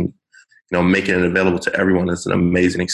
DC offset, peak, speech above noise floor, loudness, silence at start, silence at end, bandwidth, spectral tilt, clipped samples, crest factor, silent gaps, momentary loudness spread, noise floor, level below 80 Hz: under 0.1%; -4 dBFS; 35 dB; -17 LUFS; 0 s; 0 s; 11.5 kHz; -6 dB/octave; under 0.1%; 14 dB; none; 4 LU; -52 dBFS; -40 dBFS